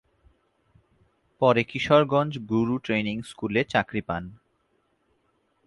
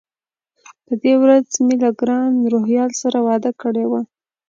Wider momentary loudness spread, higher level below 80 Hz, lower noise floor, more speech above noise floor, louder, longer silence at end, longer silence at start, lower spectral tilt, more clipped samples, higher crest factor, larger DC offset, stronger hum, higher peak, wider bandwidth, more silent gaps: first, 12 LU vs 8 LU; first, -56 dBFS vs -70 dBFS; second, -70 dBFS vs under -90 dBFS; second, 46 dB vs over 74 dB; second, -25 LUFS vs -17 LUFS; first, 1.35 s vs 0.45 s; first, 1.4 s vs 0.7 s; first, -6.5 dB/octave vs -5 dB/octave; neither; first, 22 dB vs 16 dB; neither; neither; second, -6 dBFS vs -2 dBFS; first, 11.5 kHz vs 7.6 kHz; neither